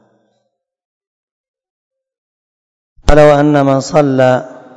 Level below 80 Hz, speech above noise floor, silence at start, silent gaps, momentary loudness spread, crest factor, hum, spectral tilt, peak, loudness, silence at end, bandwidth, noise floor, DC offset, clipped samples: -26 dBFS; 59 dB; 3.05 s; none; 7 LU; 14 dB; none; -6.5 dB/octave; 0 dBFS; -10 LUFS; 0.3 s; 11 kHz; -67 dBFS; under 0.1%; 1%